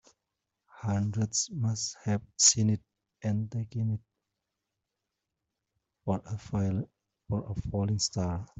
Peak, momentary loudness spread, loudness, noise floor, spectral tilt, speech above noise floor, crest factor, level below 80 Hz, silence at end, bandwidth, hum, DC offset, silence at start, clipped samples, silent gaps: -8 dBFS; 14 LU; -30 LUFS; -86 dBFS; -4 dB/octave; 56 dB; 24 dB; -56 dBFS; 0.15 s; 8.2 kHz; none; under 0.1%; 0.75 s; under 0.1%; none